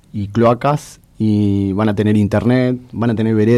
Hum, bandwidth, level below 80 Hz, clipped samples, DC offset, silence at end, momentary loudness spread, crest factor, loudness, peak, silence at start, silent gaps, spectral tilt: none; 12.5 kHz; -48 dBFS; under 0.1%; under 0.1%; 0 s; 6 LU; 12 dB; -16 LUFS; -4 dBFS; 0.15 s; none; -8 dB/octave